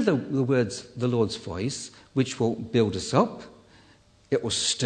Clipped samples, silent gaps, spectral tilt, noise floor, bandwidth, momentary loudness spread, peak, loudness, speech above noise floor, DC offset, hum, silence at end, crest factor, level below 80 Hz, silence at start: under 0.1%; none; -5 dB/octave; -57 dBFS; 9.4 kHz; 7 LU; -6 dBFS; -26 LUFS; 32 dB; under 0.1%; none; 0 s; 20 dB; -58 dBFS; 0 s